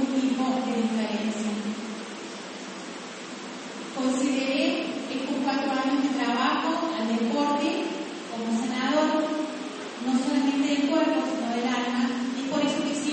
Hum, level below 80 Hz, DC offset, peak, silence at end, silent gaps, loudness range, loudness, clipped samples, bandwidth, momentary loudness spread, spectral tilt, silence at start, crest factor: none; -70 dBFS; under 0.1%; -12 dBFS; 0 s; none; 5 LU; -27 LUFS; under 0.1%; 8.8 kHz; 13 LU; -4 dB/octave; 0 s; 16 dB